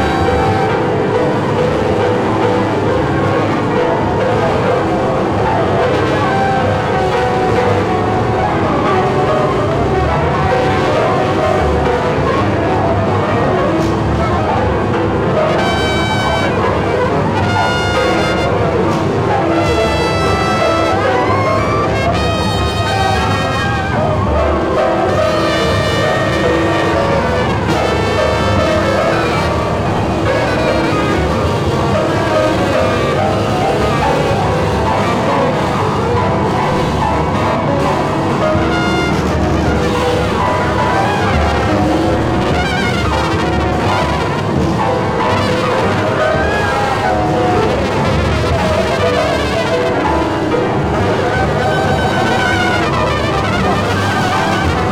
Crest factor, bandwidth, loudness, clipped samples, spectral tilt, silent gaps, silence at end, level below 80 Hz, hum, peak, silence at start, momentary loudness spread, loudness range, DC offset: 12 dB; 15.5 kHz; -14 LUFS; under 0.1%; -6 dB/octave; none; 0 s; -28 dBFS; none; 0 dBFS; 0 s; 2 LU; 1 LU; under 0.1%